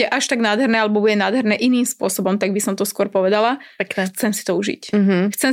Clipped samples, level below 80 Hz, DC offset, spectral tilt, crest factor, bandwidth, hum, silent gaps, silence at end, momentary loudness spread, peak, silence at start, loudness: under 0.1%; -64 dBFS; under 0.1%; -4.5 dB/octave; 14 dB; 16.5 kHz; none; none; 0 s; 5 LU; -4 dBFS; 0 s; -18 LUFS